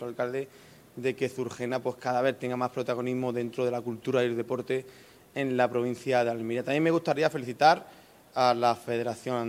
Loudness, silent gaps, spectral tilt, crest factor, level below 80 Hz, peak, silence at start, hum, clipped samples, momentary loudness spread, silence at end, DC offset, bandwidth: -29 LUFS; none; -6 dB/octave; 22 dB; -74 dBFS; -8 dBFS; 0 s; none; under 0.1%; 9 LU; 0 s; under 0.1%; 16 kHz